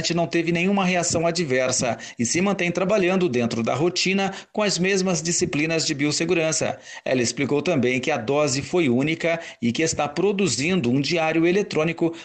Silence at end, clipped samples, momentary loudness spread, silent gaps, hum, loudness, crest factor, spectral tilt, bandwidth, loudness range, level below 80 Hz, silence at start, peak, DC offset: 0 s; under 0.1%; 4 LU; none; none; -22 LUFS; 12 dB; -4 dB/octave; 9.2 kHz; 1 LU; -56 dBFS; 0 s; -10 dBFS; under 0.1%